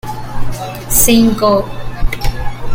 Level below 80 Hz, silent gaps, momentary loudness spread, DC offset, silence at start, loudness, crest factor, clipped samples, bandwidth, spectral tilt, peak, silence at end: -20 dBFS; none; 16 LU; under 0.1%; 0.05 s; -13 LUFS; 12 dB; under 0.1%; 17 kHz; -4 dB/octave; 0 dBFS; 0 s